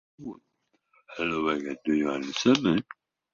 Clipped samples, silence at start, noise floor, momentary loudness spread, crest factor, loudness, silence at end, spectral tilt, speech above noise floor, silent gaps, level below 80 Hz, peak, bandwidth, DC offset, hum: under 0.1%; 0.2 s; -69 dBFS; 20 LU; 20 dB; -27 LUFS; 0.5 s; -5 dB/octave; 42 dB; none; -62 dBFS; -8 dBFS; 7.6 kHz; under 0.1%; none